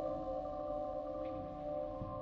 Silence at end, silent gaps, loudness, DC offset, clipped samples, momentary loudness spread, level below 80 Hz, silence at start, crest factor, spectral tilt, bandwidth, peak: 0 s; none; -42 LUFS; under 0.1%; under 0.1%; 2 LU; -56 dBFS; 0 s; 14 dB; -9.5 dB/octave; 6.6 kHz; -28 dBFS